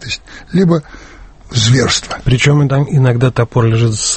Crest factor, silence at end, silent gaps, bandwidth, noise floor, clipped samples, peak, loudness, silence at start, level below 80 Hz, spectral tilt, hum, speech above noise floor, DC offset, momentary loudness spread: 12 dB; 0 s; none; 8.8 kHz; -36 dBFS; under 0.1%; 0 dBFS; -13 LUFS; 0 s; -34 dBFS; -5 dB/octave; none; 24 dB; under 0.1%; 8 LU